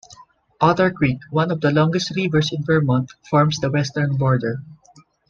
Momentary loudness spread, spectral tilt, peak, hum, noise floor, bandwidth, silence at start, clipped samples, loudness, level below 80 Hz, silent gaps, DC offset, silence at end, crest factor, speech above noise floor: 4 LU; -6.5 dB/octave; -2 dBFS; none; -53 dBFS; 7.4 kHz; 0.1 s; under 0.1%; -19 LUFS; -50 dBFS; none; under 0.1%; 0.55 s; 18 dB; 34 dB